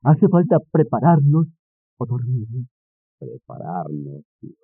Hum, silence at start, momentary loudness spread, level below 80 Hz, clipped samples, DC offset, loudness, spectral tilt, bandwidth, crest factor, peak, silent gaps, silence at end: none; 0.05 s; 23 LU; -68 dBFS; under 0.1%; under 0.1%; -19 LUFS; -12 dB/octave; 3 kHz; 16 dB; -4 dBFS; 1.59-1.97 s, 2.71-3.18 s, 4.25-4.39 s; 0.15 s